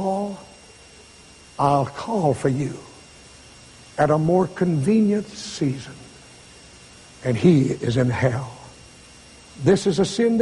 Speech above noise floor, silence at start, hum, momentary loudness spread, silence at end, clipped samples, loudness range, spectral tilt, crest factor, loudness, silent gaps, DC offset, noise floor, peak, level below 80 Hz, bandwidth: 27 dB; 0 s; none; 19 LU; 0 s; under 0.1%; 4 LU; -6.5 dB/octave; 18 dB; -21 LUFS; none; under 0.1%; -47 dBFS; -4 dBFS; -52 dBFS; 11.5 kHz